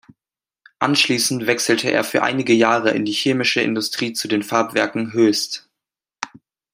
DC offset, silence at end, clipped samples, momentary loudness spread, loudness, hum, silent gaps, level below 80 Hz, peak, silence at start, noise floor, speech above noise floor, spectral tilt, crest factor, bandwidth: under 0.1%; 0.45 s; under 0.1%; 10 LU; -18 LUFS; none; none; -66 dBFS; 0 dBFS; 0.8 s; under -90 dBFS; over 72 dB; -3.5 dB/octave; 20 dB; 16 kHz